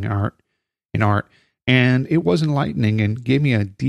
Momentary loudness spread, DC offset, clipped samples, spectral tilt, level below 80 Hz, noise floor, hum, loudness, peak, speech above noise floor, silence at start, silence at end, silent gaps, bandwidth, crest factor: 8 LU; under 0.1%; under 0.1%; -7.5 dB/octave; -50 dBFS; -41 dBFS; none; -19 LUFS; -2 dBFS; 23 dB; 0 s; 0 s; 0.85-0.89 s; 10.5 kHz; 18 dB